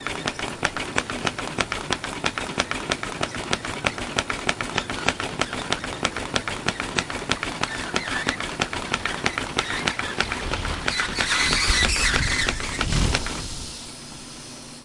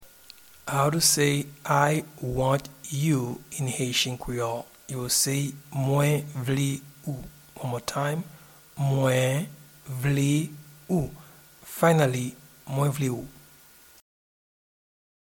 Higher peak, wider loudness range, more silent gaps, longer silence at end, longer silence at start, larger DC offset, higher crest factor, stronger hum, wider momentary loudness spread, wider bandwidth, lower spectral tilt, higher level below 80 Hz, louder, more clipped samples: first, -2 dBFS vs -6 dBFS; about the same, 5 LU vs 4 LU; neither; second, 0 s vs 2.05 s; about the same, 0 s vs 0 s; neither; about the same, 24 dB vs 22 dB; neither; second, 8 LU vs 15 LU; second, 11.5 kHz vs 19 kHz; second, -2.5 dB/octave vs -4.5 dB/octave; first, -36 dBFS vs -54 dBFS; about the same, -25 LUFS vs -26 LUFS; neither